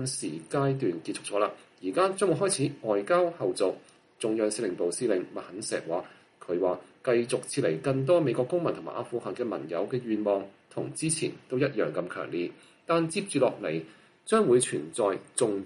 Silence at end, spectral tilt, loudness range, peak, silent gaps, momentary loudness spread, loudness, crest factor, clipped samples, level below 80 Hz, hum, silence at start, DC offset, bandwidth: 0 s; -5 dB/octave; 3 LU; -10 dBFS; none; 10 LU; -29 LUFS; 18 dB; under 0.1%; -74 dBFS; none; 0 s; under 0.1%; 11.5 kHz